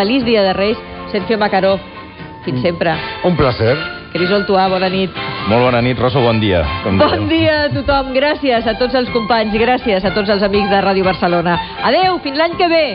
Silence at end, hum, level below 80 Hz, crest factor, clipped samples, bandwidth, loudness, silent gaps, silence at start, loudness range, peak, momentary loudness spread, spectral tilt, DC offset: 0 s; none; -36 dBFS; 14 dB; under 0.1%; 5.6 kHz; -14 LUFS; none; 0 s; 3 LU; 0 dBFS; 6 LU; -4 dB/octave; under 0.1%